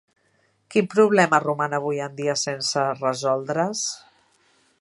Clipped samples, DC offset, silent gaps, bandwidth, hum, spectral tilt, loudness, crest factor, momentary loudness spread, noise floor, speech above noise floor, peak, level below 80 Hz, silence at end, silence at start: under 0.1%; under 0.1%; none; 11.5 kHz; none; -4 dB/octave; -22 LUFS; 22 dB; 9 LU; -65 dBFS; 43 dB; -2 dBFS; -74 dBFS; 0.85 s; 0.7 s